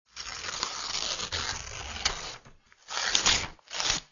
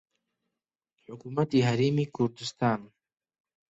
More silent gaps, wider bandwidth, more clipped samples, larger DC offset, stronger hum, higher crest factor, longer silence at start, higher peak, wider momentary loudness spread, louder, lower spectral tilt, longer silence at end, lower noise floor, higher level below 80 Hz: neither; about the same, 7.6 kHz vs 8 kHz; neither; neither; neither; first, 28 dB vs 18 dB; second, 0.15 s vs 1.1 s; first, -4 dBFS vs -12 dBFS; first, 14 LU vs 11 LU; about the same, -29 LUFS vs -28 LUFS; second, 0 dB/octave vs -6.5 dB/octave; second, 0.05 s vs 0.85 s; second, -56 dBFS vs -89 dBFS; first, -50 dBFS vs -68 dBFS